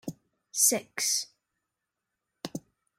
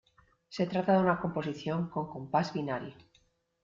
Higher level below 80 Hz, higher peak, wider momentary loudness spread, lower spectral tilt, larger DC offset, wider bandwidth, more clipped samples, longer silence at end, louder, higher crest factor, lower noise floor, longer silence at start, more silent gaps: second, -78 dBFS vs -66 dBFS; first, -10 dBFS vs -14 dBFS; first, 20 LU vs 12 LU; second, -1 dB/octave vs -7.5 dB/octave; neither; first, 16.5 kHz vs 7.4 kHz; neither; second, 0.4 s vs 0.7 s; first, -26 LUFS vs -32 LUFS; first, 24 dB vs 18 dB; first, -85 dBFS vs -70 dBFS; second, 0.05 s vs 0.5 s; neither